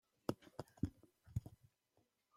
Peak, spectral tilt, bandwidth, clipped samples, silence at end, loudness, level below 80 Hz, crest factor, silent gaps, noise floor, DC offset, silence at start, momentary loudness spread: -24 dBFS; -7.5 dB/octave; 16 kHz; under 0.1%; 0.85 s; -49 LUFS; -64 dBFS; 26 dB; none; -82 dBFS; under 0.1%; 0.3 s; 8 LU